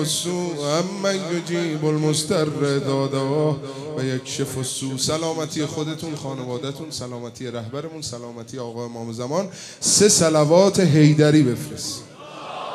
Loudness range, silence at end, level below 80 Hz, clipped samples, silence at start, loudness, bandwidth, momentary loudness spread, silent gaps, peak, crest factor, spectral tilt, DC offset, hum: 12 LU; 0 s; -62 dBFS; under 0.1%; 0 s; -21 LUFS; 14.5 kHz; 16 LU; none; -2 dBFS; 20 dB; -4.5 dB/octave; under 0.1%; none